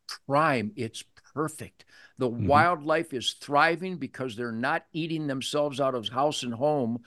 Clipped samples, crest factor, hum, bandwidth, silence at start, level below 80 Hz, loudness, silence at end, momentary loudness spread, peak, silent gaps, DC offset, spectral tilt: under 0.1%; 22 dB; none; 12.5 kHz; 0.1 s; -64 dBFS; -27 LUFS; 0.1 s; 12 LU; -6 dBFS; none; under 0.1%; -5 dB/octave